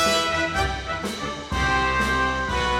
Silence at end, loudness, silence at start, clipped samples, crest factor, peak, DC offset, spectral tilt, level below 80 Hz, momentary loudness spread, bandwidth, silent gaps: 0 s; -23 LUFS; 0 s; under 0.1%; 14 dB; -8 dBFS; under 0.1%; -3.5 dB/octave; -34 dBFS; 7 LU; 16 kHz; none